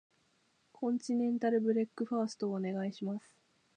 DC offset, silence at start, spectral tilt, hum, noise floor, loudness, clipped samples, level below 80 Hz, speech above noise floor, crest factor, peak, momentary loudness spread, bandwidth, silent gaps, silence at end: under 0.1%; 0.8 s; -7 dB/octave; none; -74 dBFS; -35 LUFS; under 0.1%; -88 dBFS; 40 dB; 16 dB; -20 dBFS; 9 LU; 9.6 kHz; none; 0.6 s